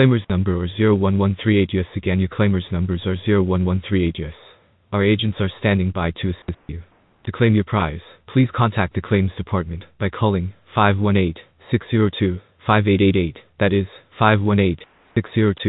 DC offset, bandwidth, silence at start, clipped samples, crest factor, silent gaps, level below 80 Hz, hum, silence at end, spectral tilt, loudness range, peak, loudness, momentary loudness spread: under 0.1%; 4.1 kHz; 0 s; under 0.1%; 18 dB; none; -42 dBFS; none; 0 s; -12.5 dB/octave; 3 LU; -2 dBFS; -20 LUFS; 11 LU